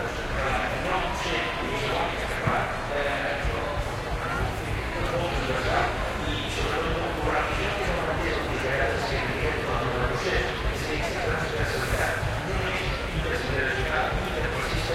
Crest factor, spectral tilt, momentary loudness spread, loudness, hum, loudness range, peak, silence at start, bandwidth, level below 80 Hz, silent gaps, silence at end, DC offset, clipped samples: 16 dB; -5 dB/octave; 3 LU; -27 LUFS; none; 1 LU; -10 dBFS; 0 s; 16.5 kHz; -34 dBFS; none; 0 s; under 0.1%; under 0.1%